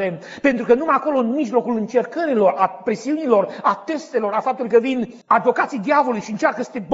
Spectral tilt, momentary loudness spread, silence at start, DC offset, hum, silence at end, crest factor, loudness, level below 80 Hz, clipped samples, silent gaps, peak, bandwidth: -4.5 dB/octave; 6 LU; 0 s; under 0.1%; none; 0 s; 16 dB; -19 LUFS; -64 dBFS; under 0.1%; none; -2 dBFS; 8 kHz